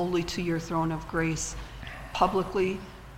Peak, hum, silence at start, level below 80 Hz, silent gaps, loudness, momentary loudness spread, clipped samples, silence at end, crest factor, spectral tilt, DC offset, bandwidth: -10 dBFS; none; 0 s; -44 dBFS; none; -29 LUFS; 13 LU; under 0.1%; 0 s; 20 dB; -5 dB/octave; under 0.1%; 16 kHz